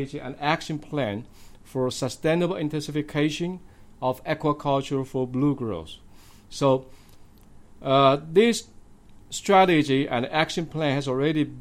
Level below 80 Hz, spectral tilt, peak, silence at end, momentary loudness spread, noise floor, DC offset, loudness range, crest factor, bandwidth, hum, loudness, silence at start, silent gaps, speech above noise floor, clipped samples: -52 dBFS; -5.5 dB/octave; -6 dBFS; 0 s; 13 LU; -49 dBFS; under 0.1%; 6 LU; 20 dB; 16 kHz; none; -24 LUFS; 0 s; none; 25 dB; under 0.1%